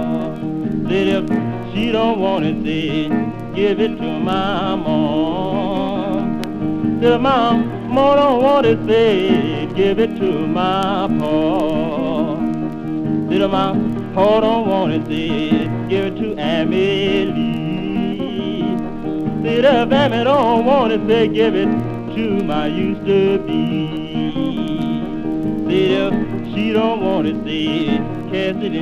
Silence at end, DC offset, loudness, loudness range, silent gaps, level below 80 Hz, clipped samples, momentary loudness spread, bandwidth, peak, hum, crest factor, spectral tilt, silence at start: 0 s; under 0.1%; -17 LUFS; 4 LU; none; -42 dBFS; under 0.1%; 8 LU; 9.6 kHz; 0 dBFS; none; 16 dB; -7.5 dB/octave; 0 s